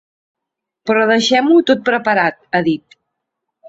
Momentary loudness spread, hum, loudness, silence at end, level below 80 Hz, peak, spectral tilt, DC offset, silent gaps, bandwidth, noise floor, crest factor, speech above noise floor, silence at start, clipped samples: 8 LU; none; -14 LUFS; 0 s; -60 dBFS; -2 dBFS; -4.5 dB/octave; under 0.1%; none; 8 kHz; -81 dBFS; 16 dB; 67 dB; 0.85 s; under 0.1%